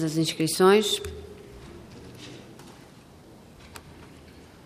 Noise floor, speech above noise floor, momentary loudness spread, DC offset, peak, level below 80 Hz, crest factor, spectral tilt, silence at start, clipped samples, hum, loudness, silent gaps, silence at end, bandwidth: -50 dBFS; 27 dB; 28 LU; under 0.1%; -6 dBFS; -56 dBFS; 22 dB; -4.5 dB/octave; 0 s; under 0.1%; none; -22 LUFS; none; 0.35 s; 15.5 kHz